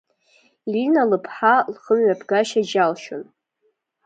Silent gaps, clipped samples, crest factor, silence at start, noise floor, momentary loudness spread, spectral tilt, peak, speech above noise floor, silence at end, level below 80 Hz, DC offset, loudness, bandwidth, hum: none; under 0.1%; 18 dB; 0.65 s; -69 dBFS; 14 LU; -5 dB/octave; -4 dBFS; 50 dB; 0.8 s; -74 dBFS; under 0.1%; -19 LUFS; 9.2 kHz; none